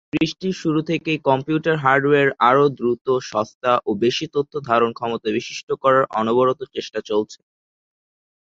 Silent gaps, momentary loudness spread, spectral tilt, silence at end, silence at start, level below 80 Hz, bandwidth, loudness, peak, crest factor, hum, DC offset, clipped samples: 3.01-3.05 s, 3.55-3.61 s, 5.63-5.67 s; 9 LU; -5.5 dB/octave; 1.1 s; 0.15 s; -60 dBFS; 7.8 kHz; -20 LUFS; -2 dBFS; 18 dB; none; under 0.1%; under 0.1%